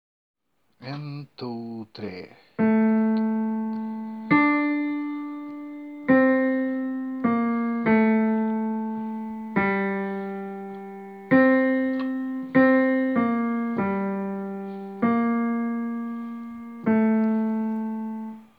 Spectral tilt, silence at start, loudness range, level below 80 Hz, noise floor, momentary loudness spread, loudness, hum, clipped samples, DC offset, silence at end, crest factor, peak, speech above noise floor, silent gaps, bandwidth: -9.5 dB/octave; 0.8 s; 4 LU; -66 dBFS; -52 dBFS; 17 LU; -24 LUFS; none; under 0.1%; under 0.1%; 0.15 s; 18 dB; -6 dBFS; 21 dB; none; 5 kHz